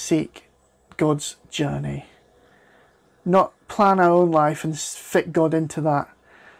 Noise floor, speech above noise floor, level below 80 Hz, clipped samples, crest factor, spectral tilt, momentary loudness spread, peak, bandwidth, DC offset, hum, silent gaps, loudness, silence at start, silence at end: -57 dBFS; 37 dB; -56 dBFS; under 0.1%; 16 dB; -5.5 dB/octave; 15 LU; -6 dBFS; 15.5 kHz; under 0.1%; none; none; -21 LUFS; 0 s; 0.55 s